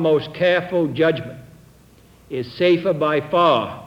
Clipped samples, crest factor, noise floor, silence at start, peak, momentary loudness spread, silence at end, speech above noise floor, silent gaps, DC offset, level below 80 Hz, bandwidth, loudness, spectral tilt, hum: under 0.1%; 16 dB; -50 dBFS; 0 s; -4 dBFS; 13 LU; 0 s; 31 dB; none; under 0.1%; -56 dBFS; 12.5 kHz; -19 LUFS; -7 dB/octave; none